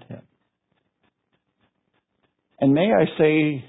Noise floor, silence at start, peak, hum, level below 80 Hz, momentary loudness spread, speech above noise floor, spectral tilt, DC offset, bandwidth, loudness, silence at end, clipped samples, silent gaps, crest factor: -73 dBFS; 0.1 s; -6 dBFS; none; -64 dBFS; 3 LU; 54 dB; -11.5 dB/octave; under 0.1%; 4 kHz; -19 LUFS; 0.05 s; under 0.1%; none; 18 dB